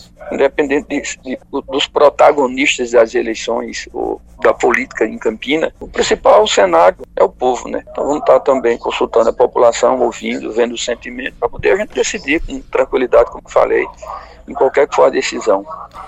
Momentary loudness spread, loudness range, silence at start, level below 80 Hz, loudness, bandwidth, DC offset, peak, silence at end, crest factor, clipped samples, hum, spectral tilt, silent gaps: 11 LU; 3 LU; 0.2 s; -40 dBFS; -14 LUFS; 9 kHz; under 0.1%; 0 dBFS; 0 s; 14 dB; 0.1%; none; -3 dB/octave; none